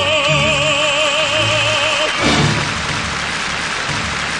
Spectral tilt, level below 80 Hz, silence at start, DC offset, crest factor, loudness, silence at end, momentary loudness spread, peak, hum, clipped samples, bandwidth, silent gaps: -3 dB/octave; -38 dBFS; 0 s; 0.2%; 14 dB; -15 LUFS; 0 s; 6 LU; -2 dBFS; none; under 0.1%; 11 kHz; none